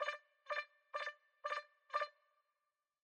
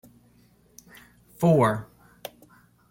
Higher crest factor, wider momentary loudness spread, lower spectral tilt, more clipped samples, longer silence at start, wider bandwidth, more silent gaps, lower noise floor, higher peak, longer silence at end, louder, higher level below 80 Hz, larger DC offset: about the same, 22 dB vs 20 dB; second, 6 LU vs 23 LU; second, 2 dB/octave vs -7.5 dB/octave; neither; second, 0 s vs 1.4 s; second, 11 kHz vs 17 kHz; neither; first, under -90 dBFS vs -59 dBFS; second, -26 dBFS vs -8 dBFS; about the same, 0.95 s vs 1.05 s; second, -46 LUFS vs -23 LUFS; second, under -90 dBFS vs -60 dBFS; neither